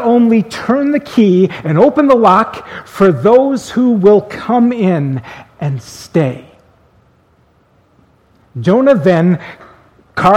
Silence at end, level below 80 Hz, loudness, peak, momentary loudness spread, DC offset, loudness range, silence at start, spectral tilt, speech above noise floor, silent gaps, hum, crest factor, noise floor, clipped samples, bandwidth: 0 s; -50 dBFS; -12 LUFS; 0 dBFS; 15 LU; under 0.1%; 11 LU; 0 s; -7.5 dB/octave; 41 dB; none; none; 12 dB; -52 dBFS; 0.2%; 13 kHz